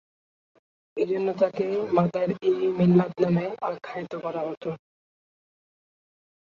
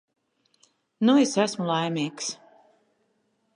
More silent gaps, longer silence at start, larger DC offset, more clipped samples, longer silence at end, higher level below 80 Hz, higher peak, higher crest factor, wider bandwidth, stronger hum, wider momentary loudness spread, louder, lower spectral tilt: first, 4.57-4.61 s vs none; about the same, 0.95 s vs 1 s; neither; neither; first, 1.8 s vs 1.2 s; first, -68 dBFS vs -80 dBFS; about the same, -6 dBFS vs -8 dBFS; about the same, 20 dB vs 18 dB; second, 7 kHz vs 11 kHz; neither; about the same, 14 LU vs 13 LU; about the same, -25 LUFS vs -24 LUFS; first, -9.5 dB/octave vs -4.5 dB/octave